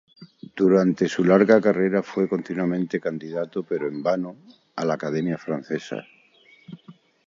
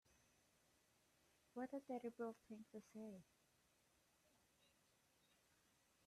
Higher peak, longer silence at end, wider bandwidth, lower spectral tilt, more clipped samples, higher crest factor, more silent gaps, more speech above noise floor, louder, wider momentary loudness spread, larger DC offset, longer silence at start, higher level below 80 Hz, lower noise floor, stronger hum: first, -2 dBFS vs -40 dBFS; second, 0.35 s vs 2.85 s; second, 7.6 kHz vs 14 kHz; first, -7.5 dB/octave vs -6 dB/octave; neither; about the same, 20 dB vs 20 dB; neither; first, 33 dB vs 27 dB; first, -23 LUFS vs -54 LUFS; first, 12 LU vs 9 LU; neither; about the same, 0.2 s vs 0.1 s; first, -68 dBFS vs under -90 dBFS; second, -56 dBFS vs -80 dBFS; neither